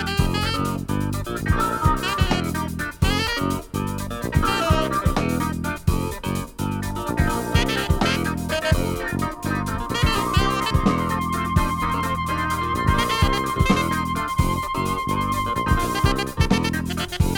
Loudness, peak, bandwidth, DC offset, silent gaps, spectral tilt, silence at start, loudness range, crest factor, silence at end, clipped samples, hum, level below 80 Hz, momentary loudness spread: -23 LUFS; -4 dBFS; 18 kHz; under 0.1%; none; -5 dB/octave; 0 s; 2 LU; 18 dB; 0 s; under 0.1%; none; -30 dBFS; 6 LU